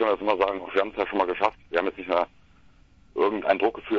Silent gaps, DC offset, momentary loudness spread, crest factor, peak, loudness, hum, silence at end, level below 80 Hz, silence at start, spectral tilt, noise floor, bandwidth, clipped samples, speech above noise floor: none; under 0.1%; 4 LU; 22 dB; -4 dBFS; -26 LUFS; none; 0 s; -58 dBFS; 0 s; -6 dB/octave; -55 dBFS; 7.2 kHz; under 0.1%; 30 dB